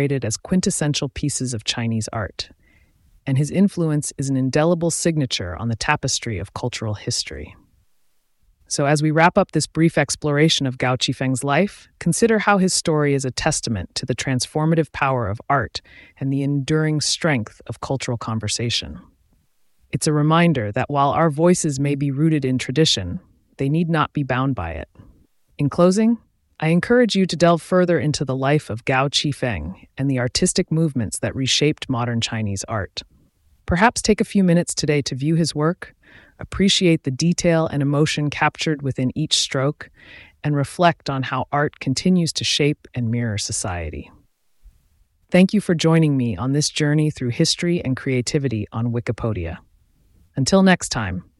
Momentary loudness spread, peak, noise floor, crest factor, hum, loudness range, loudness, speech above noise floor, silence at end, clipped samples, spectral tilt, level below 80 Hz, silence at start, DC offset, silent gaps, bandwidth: 10 LU; -2 dBFS; -64 dBFS; 18 dB; none; 4 LU; -20 LUFS; 44 dB; 0.15 s; under 0.1%; -5 dB/octave; -46 dBFS; 0 s; under 0.1%; none; 12 kHz